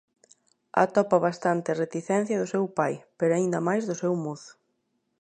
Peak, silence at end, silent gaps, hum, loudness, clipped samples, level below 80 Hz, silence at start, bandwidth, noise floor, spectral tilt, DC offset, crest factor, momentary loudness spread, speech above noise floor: -4 dBFS; 0.7 s; none; none; -26 LUFS; under 0.1%; -74 dBFS; 0.75 s; 9.6 kHz; -75 dBFS; -6.5 dB/octave; under 0.1%; 22 dB; 7 LU; 49 dB